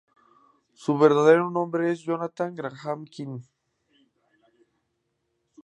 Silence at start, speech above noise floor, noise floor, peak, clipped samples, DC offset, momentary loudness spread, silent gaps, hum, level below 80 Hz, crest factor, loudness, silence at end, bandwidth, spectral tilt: 0.8 s; 53 dB; -76 dBFS; -6 dBFS; under 0.1%; under 0.1%; 19 LU; none; none; -82 dBFS; 22 dB; -24 LUFS; 2.2 s; 9.4 kHz; -7 dB/octave